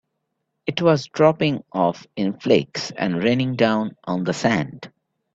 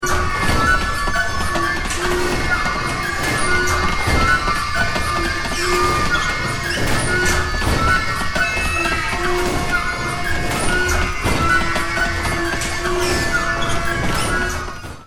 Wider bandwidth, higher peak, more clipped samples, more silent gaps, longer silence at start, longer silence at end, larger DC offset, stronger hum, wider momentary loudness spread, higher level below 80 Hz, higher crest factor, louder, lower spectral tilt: second, 8 kHz vs 19 kHz; about the same, -2 dBFS vs -4 dBFS; neither; neither; first, 0.65 s vs 0 s; first, 0.45 s vs 0 s; neither; neither; first, 10 LU vs 4 LU; second, -60 dBFS vs -26 dBFS; about the same, 20 dB vs 16 dB; second, -21 LUFS vs -18 LUFS; first, -6 dB/octave vs -3.5 dB/octave